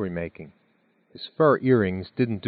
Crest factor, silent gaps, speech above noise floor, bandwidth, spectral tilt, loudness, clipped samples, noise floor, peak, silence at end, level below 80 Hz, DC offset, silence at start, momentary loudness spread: 20 dB; none; 42 dB; 4.8 kHz; -6.5 dB/octave; -23 LUFS; under 0.1%; -65 dBFS; -6 dBFS; 0 s; -58 dBFS; under 0.1%; 0 s; 18 LU